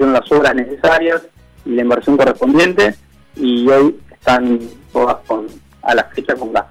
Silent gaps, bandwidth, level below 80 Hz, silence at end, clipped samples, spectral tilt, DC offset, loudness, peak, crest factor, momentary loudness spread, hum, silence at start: none; 14.5 kHz; -44 dBFS; 0.05 s; under 0.1%; -5.5 dB/octave; under 0.1%; -14 LUFS; -4 dBFS; 10 dB; 10 LU; none; 0 s